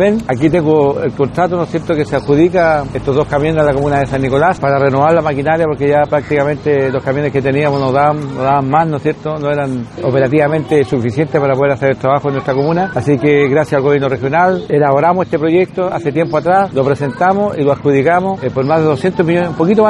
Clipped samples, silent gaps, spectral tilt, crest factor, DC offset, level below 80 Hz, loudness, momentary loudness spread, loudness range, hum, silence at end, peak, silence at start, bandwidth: under 0.1%; none; -8 dB/octave; 12 dB; under 0.1%; -40 dBFS; -13 LUFS; 5 LU; 2 LU; none; 0 s; 0 dBFS; 0 s; 10.5 kHz